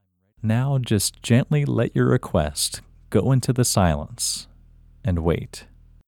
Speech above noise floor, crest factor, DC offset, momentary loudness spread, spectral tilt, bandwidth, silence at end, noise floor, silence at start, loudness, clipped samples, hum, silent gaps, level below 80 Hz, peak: 29 dB; 18 dB; under 0.1%; 10 LU; -5 dB/octave; 18 kHz; 0.45 s; -50 dBFS; 0.45 s; -22 LUFS; under 0.1%; none; none; -40 dBFS; -4 dBFS